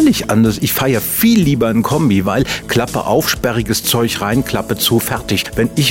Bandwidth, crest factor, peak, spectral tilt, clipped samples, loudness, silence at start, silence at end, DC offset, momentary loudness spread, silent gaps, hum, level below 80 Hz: 16.5 kHz; 12 dB; -2 dBFS; -4.5 dB/octave; under 0.1%; -14 LUFS; 0 s; 0 s; 0.2%; 5 LU; none; none; -36 dBFS